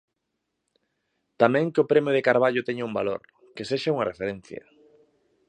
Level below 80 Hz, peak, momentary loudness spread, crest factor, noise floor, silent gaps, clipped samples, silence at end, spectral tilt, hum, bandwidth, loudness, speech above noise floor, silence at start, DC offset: -66 dBFS; -2 dBFS; 18 LU; 24 dB; -80 dBFS; none; under 0.1%; 0.9 s; -6.5 dB/octave; none; 9.6 kHz; -24 LUFS; 56 dB; 1.4 s; under 0.1%